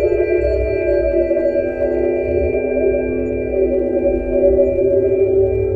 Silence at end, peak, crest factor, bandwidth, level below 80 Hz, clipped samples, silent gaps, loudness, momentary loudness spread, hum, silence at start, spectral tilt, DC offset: 0 s; -2 dBFS; 14 dB; 4.7 kHz; -30 dBFS; under 0.1%; none; -16 LUFS; 4 LU; none; 0 s; -10.5 dB/octave; under 0.1%